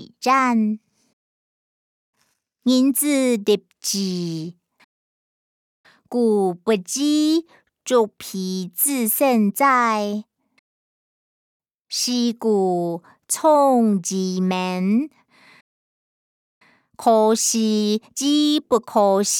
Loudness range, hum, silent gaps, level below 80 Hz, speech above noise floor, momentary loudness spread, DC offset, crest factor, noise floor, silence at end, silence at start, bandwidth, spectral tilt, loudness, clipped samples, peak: 5 LU; none; 1.13-2.13 s, 4.84-5.84 s, 10.59-11.60 s, 11.74-11.79 s, 15.61-16.61 s; -74 dBFS; 50 dB; 10 LU; under 0.1%; 16 dB; -69 dBFS; 0 s; 0 s; 19.5 kHz; -4 dB/octave; -20 LUFS; under 0.1%; -4 dBFS